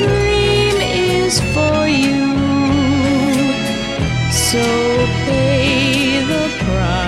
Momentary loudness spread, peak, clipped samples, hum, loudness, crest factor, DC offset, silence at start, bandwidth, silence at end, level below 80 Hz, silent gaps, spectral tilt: 4 LU; -2 dBFS; under 0.1%; none; -15 LUFS; 14 dB; under 0.1%; 0 s; 15 kHz; 0 s; -30 dBFS; none; -4.5 dB/octave